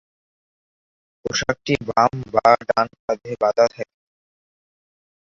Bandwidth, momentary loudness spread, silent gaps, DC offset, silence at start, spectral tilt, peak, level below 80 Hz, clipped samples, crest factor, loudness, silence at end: 7.6 kHz; 12 LU; 3.00-3.08 s; under 0.1%; 1.25 s; -4.5 dB/octave; -2 dBFS; -54 dBFS; under 0.1%; 20 dB; -20 LUFS; 1.5 s